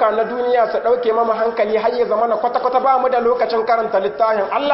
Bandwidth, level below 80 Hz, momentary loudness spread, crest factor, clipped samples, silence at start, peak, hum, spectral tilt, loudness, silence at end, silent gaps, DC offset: 5.8 kHz; -58 dBFS; 2 LU; 12 dB; under 0.1%; 0 s; -4 dBFS; none; -9 dB/octave; -17 LUFS; 0 s; none; under 0.1%